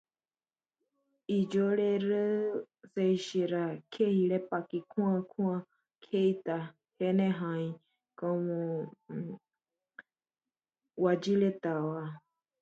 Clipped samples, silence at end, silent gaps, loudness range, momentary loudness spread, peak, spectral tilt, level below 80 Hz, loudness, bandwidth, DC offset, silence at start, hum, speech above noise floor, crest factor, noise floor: under 0.1%; 0.45 s; none; 5 LU; 13 LU; -16 dBFS; -7.5 dB/octave; -80 dBFS; -32 LUFS; 7.8 kHz; under 0.1%; 1.3 s; none; over 59 dB; 16 dB; under -90 dBFS